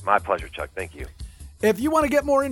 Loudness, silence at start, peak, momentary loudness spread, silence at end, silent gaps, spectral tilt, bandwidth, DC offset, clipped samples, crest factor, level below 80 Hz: -23 LUFS; 0 s; -4 dBFS; 19 LU; 0 s; none; -5.5 dB/octave; 17 kHz; under 0.1%; under 0.1%; 20 dB; -42 dBFS